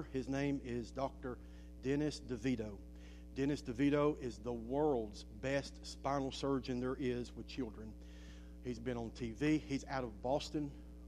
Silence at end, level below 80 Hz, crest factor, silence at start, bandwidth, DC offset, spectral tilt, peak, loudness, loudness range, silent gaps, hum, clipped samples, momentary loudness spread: 0 s; -54 dBFS; 18 dB; 0 s; 11.5 kHz; under 0.1%; -6.5 dB/octave; -22 dBFS; -40 LUFS; 4 LU; none; none; under 0.1%; 15 LU